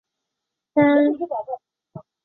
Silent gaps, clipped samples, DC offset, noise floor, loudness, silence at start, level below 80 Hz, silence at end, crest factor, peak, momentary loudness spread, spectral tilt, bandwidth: none; under 0.1%; under 0.1%; -83 dBFS; -20 LUFS; 0.75 s; -68 dBFS; 0.25 s; 16 dB; -6 dBFS; 17 LU; -10.5 dB/octave; 4.1 kHz